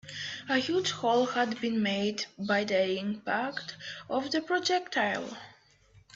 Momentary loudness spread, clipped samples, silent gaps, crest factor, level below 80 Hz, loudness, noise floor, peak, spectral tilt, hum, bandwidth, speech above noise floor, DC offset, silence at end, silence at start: 10 LU; under 0.1%; none; 16 dB; -72 dBFS; -30 LUFS; -61 dBFS; -14 dBFS; -4 dB/octave; none; 8 kHz; 31 dB; under 0.1%; 0.15 s; 0.05 s